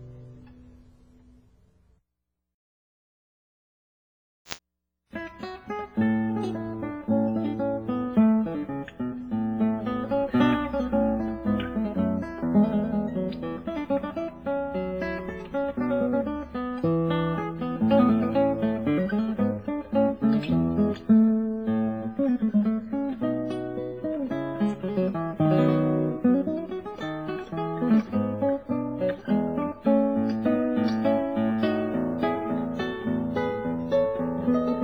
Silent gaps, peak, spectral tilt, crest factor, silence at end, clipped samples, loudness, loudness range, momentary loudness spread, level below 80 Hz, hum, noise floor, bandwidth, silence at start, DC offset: 2.54-4.45 s; -6 dBFS; -8.5 dB/octave; 20 dB; 0 s; under 0.1%; -26 LUFS; 5 LU; 10 LU; -52 dBFS; none; -83 dBFS; over 20 kHz; 0 s; 0.1%